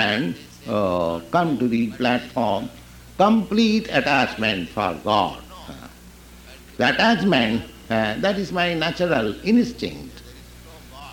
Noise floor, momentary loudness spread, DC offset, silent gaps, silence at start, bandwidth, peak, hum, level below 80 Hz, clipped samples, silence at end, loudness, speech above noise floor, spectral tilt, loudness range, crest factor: -44 dBFS; 20 LU; under 0.1%; none; 0 s; 17 kHz; -4 dBFS; none; -48 dBFS; under 0.1%; 0 s; -21 LUFS; 23 dB; -5.5 dB/octave; 2 LU; 18 dB